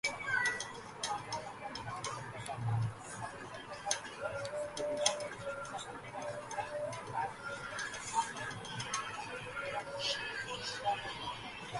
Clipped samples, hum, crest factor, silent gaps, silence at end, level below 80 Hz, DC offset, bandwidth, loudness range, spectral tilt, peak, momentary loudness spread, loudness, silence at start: under 0.1%; none; 26 dB; none; 0 s; -66 dBFS; under 0.1%; 11.5 kHz; 2 LU; -2.5 dB/octave; -14 dBFS; 10 LU; -39 LUFS; 0.05 s